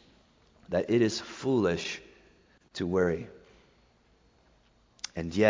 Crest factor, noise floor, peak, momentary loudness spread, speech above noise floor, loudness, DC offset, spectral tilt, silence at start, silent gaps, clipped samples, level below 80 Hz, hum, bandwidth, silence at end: 22 dB; -65 dBFS; -8 dBFS; 15 LU; 37 dB; -30 LUFS; under 0.1%; -5.5 dB/octave; 0.7 s; none; under 0.1%; -56 dBFS; none; 7.6 kHz; 0 s